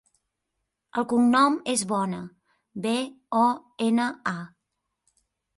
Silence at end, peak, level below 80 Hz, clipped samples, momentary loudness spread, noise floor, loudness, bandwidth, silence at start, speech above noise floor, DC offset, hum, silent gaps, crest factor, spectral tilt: 1.1 s; -8 dBFS; -70 dBFS; under 0.1%; 16 LU; -81 dBFS; -25 LUFS; 11.5 kHz; 0.95 s; 57 dB; under 0.1%; none; none; 18 dB; -4 dB/octave